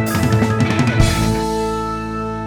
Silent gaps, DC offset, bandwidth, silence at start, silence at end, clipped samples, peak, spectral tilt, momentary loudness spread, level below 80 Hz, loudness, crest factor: none; under 0.1%; over 20 kHz; 0 s; 0 s; under 0.1%; 0 dBFS; -6 dB/octave; 8 LU; -28 dBFS; -17 LUFS; 16 dB